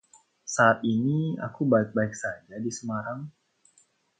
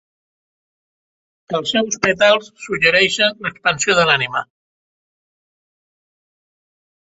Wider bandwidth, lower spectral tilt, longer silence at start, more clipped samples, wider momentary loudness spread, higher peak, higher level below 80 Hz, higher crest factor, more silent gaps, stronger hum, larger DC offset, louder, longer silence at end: first, 9.4 kHz vs 8 kHz; first, -6 dB/octave vs -2.5 dB/octave; second, 0.45 s vs 1.5 s; neither; first, 15 LU vs 10 LU; second, -6 dBFS vs 0 dBFS; second, -68 dBFS vs -56 dBFS; about the same, 22 dB vs 20 dB; neither; neither; neither; second, -27 LUFS vs -16 LUFS; second, 0.9 s vs 2.6 s